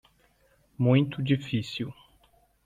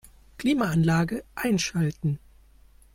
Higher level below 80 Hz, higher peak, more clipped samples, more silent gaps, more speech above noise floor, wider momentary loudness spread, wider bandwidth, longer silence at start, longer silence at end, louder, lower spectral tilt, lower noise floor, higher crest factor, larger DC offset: second, -62 dBFS vs -50 dBFS; about the same, -10 dBFS vs -10 dBFS; neither; neither; first, 39 dB vs 30 dB; first, 12 LU vs 8 LU; second, 7.6 kHz vs 16.5 kHz; first, 0.8 s vs 0.4 s; about the same, 0.75 s vs 0.75 s; about the same, -27 LUFS vs -26 LUFS; first, -7.5 dB/octave vs -5.5 dB/octave; first, -65 dBFS vs -54 dBFS; about the same, 18 dB vs 16 dB; neither